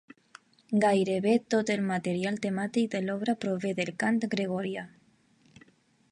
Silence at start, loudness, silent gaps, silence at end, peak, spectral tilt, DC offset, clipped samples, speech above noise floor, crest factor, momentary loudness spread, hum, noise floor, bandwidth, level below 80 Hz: 0.7 s; -29 LUFS; none; 1.25 s; -12 dBFS; -6 dB/octave; under 0.1%; under 0.1%; 36 dB; 18 dB; 6 LU; none; -64 dBFS; 11 kHz; -74 dBFS